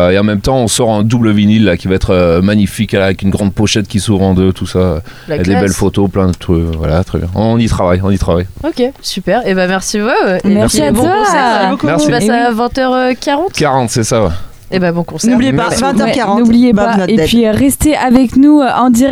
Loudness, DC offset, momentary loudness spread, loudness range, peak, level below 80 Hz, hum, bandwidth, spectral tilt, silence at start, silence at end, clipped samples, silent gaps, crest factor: -11 LUFS; under 0.1%; 5 LU; 3 LU; 0 dBFS; -28 dBFS; none; 16 kHz; -5.5 dB/octave; 0 s; 0 s; under 0.1%; none; 10 dB